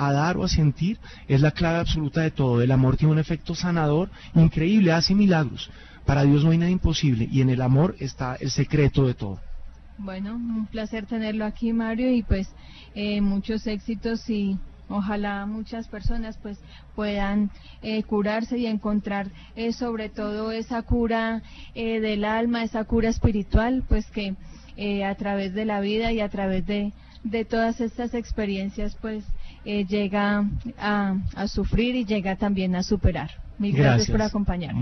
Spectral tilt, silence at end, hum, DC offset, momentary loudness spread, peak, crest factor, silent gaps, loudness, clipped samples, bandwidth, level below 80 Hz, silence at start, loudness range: -7 dB/octave; 0 s; none; under 0.1%; 13 LU; -6 dBFS; 18 dB; none; -24 LUFS; under 0.1%; 6.4 kHz; -36 dBFS; 0 s; 7 LU